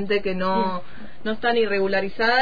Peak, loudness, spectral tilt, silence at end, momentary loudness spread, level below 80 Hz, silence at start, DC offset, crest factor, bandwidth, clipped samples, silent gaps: -8 dBFS; -23 LUFS; -6.5 dB/octave; 0 s; 12 LU; -50 dBFS; 0 s; 4%; 14 dB; 5 kHz; under 0.1%; none